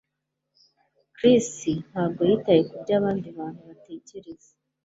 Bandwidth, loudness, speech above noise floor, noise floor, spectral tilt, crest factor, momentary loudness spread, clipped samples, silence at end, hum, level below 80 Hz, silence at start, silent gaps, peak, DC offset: 8 kHz; -23 LUFS; 57 dB; -81 dBFS; -6 dB/octave; 20 dB; 23 LU; under 0.1%; 0.5 s; none; -62 dBFS; 1.2 s; none; -6 dBFS; under 0.1%